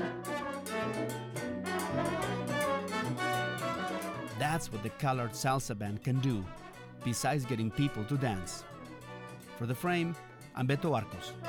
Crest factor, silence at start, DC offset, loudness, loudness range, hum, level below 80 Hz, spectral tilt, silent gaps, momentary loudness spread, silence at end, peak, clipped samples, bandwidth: 16 dB; 0 s; under 0.1%; -34 LUFS; 2 LU; none; -60 dBFS; -5.5 dB/octave; none; 13 LU; 0 s; -18 dBFS; under 0.1%; 19.5 kHz